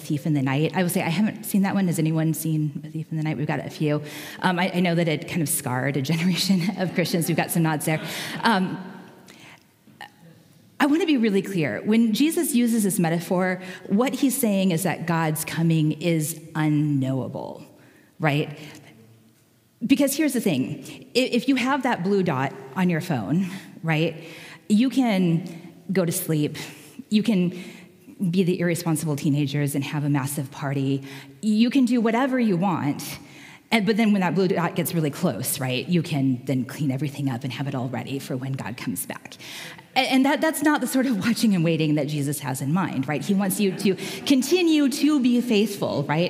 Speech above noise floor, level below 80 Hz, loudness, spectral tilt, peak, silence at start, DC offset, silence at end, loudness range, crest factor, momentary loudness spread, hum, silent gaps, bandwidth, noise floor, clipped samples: 36 dB; -72 dBFS; -23 LUFS; -5.5 dB/octave; -4 dBFS; 0 s; under 0.1%; 0 s; 4 LU; 18 dB; 10 LU; none; none; 16 kHz; -59 dBFS; under 0.1%